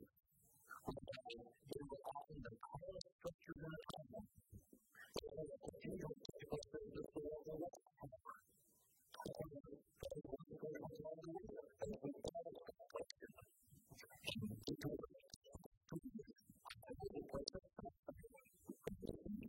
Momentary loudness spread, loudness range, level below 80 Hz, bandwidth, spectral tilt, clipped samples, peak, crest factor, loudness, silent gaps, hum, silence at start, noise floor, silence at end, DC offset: 14 LU; 3 LU; -70 dBFS; 16.5 kHz; -5.5 dB/octave; under 0.1%; -26 dBFS; 28 dB; -54 LUFS; 3.12-3.19 s, 3.34-3.39 s, 15.36-15.41 s, 15.66-15.81 s, 17.99-18.03 s; none; 0 s; -77 dBFS; 0 s; under 0.1%